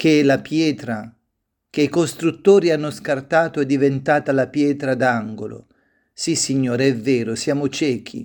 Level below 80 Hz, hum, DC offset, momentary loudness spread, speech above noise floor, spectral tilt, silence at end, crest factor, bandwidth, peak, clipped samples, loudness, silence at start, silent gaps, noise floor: -62 dBFS; none; under 0.1%; 12 LU; 56 dB; -5 dB/octave; 0 s; 18 dB; 19 kHz; -2 dBFS; under 0.1%; -19 LUFS; 0 s; none; -75 dBFS